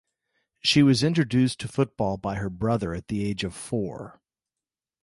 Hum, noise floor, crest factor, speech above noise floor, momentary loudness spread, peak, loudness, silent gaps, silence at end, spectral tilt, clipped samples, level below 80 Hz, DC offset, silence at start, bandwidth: none; under -90 dBFS; 18 dB; over 66 dB; 11 LU; -8 dBFS; -25 LUFS; none; 0.9 s; -5.5 dB/octave; under 0.1%; -50 dBFS; under 0.1%; 0.65 s; 11.5 kHz